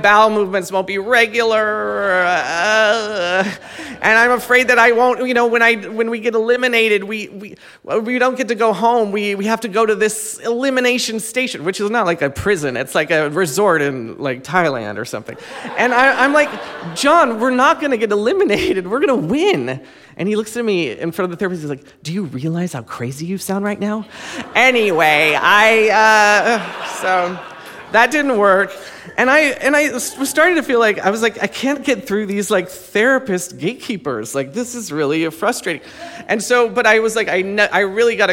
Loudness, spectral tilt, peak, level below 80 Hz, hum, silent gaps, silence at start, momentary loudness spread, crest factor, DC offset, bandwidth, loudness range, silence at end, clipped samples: -15 LUFS; -3.5 dB/octave; 0 dBFS; -54 dBFS; none; none; 0 s; 13 LU; 16 dB; under 0.1%; 17 kHz; 6 LU; 0 s; under 0.1%